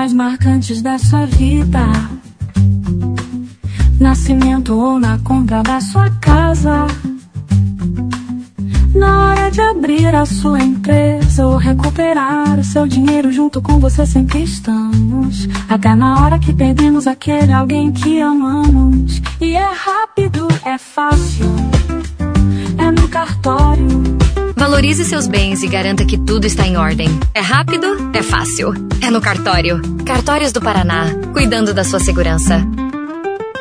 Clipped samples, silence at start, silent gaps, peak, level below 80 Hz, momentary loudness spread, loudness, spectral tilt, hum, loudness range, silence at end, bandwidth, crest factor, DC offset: under 0.1%; 0 s; none; 0 dBFS; -18 dBFS; 7 LU; -13 LUFS; -6 dB/octave; none; 3 LU; 0 s; 10.5 kHz; 12 dB; under 0.1%